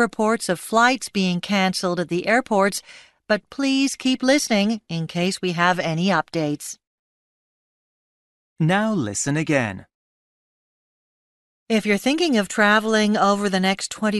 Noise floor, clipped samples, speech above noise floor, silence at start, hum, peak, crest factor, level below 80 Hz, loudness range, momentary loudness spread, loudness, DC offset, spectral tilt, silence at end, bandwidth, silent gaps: under -90 dBFS; under 0.1%; over 69 dB; 0 s; none; -4 dBFS; 18 dB; -62 dBFS; 5 LU; 7 LU; -21 LUFS; under 0.1%; -4.5 dB/octave; 0 s; 12.5 kHz; 6.87-8.56 s, 9.94-11.66 s